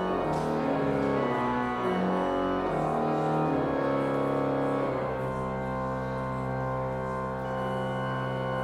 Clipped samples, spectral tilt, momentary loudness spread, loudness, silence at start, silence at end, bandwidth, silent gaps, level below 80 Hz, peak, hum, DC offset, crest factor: under 0.1%; -8 dB/octave; 5 LU; -29 LUFS; 0 s; 0 s; 13.5 kHz; none; -50 dBFS; -16 dBFS; none; under 0.1%; 12 dB